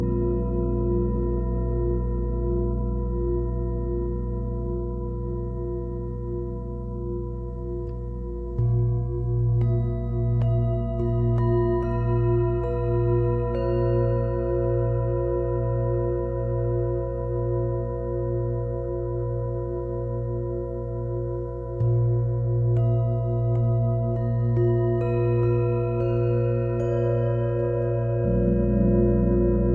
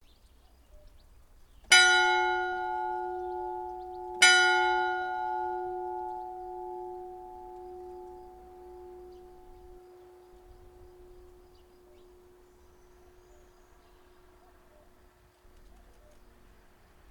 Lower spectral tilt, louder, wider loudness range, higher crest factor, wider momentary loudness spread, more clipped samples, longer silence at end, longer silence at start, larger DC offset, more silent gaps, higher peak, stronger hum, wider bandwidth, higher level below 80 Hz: first, -12 dB/octave vs 0 dB/octave; about the same, -25 LUFS vs -26 LUFS; second, 6 LU vs 23 LU; second, 14 dB vs 28 dB; second, 8 LU vs 29 LU; neither; second, 0 s vs 5.9 s; second, 0 s vs 0.75 s; neither; neither; second, -10 dBFS vs -6 dBFS; first, 60 Hz at -55 dBFS vs none; second, 3 kHz vs 17.5 kHz; first, -32 dBFS vs -60 dBFS